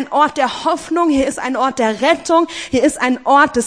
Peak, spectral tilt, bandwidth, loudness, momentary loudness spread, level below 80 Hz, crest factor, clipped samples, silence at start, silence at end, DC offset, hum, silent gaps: 0 dBFS; -3.5 dB/octave; 10.5 kHz; -15 LUFS; 5 LU; -46 dBFS; 16 dB; under 0.1%; 0 s; 0 s; 0.2%; none; none